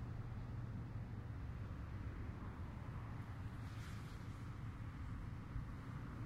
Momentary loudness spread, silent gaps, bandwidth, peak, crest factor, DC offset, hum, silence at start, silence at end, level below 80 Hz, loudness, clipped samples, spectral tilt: 2 LU; none; 13.5 kHz; -34 dBFS; 14 dB; under 0.1%; none; 0 s; 0 s; -54 dBFS; -50 LUFS; under 0.1%; -7.5 dB/octave